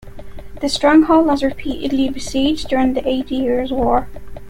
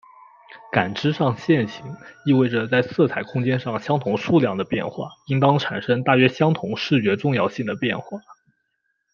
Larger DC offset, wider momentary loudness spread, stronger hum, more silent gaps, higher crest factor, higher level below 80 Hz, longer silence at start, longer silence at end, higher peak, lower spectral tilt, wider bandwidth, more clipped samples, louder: neither; about the same, 9 LU vs 11 LU; neither; neither; second, 14 dB vs 20 dB; first, -36 dBFS vs -62 dBFS; second, 0 s vs 0.5 s; second, 0 s vs 0.8 s; about the same, -2 dBFS vs -2 dBFS; second, -5 dB/octave vs -7.5 dB/octave; first, 14 kHz vs 7 kHz; neither; first, -17 LUFS vs -21 LUFS